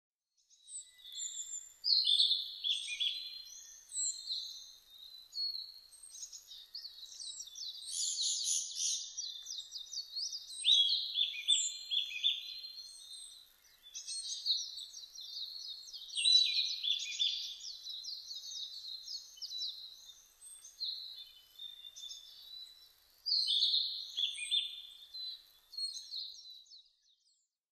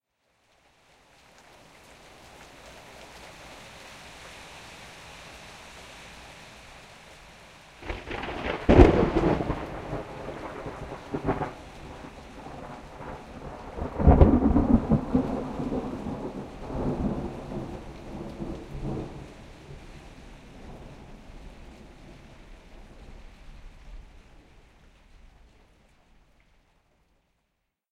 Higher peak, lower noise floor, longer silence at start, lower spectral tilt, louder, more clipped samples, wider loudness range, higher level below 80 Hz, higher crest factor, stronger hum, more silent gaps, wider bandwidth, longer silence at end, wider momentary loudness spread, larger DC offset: second, -16 dBFS vs 0 dBFS; about the same, -77 dBFS vs -78 dBFS; second, 0.65 s vs 2.25 s; second, 6.5 dB/octave vs -8 dB/octave; second, -34 LUFS vs -27 LUFS; neither; second, 11 LU vs 24 LU; second, -82 dBFS vs -36 dBFS; second, 24 dB vs 30 dB; neither; neither; first, 13.5 kHz vs 12 kHz; second, 0.9 s vs 2.75 s; second, 21 LU vs 27 LU; neither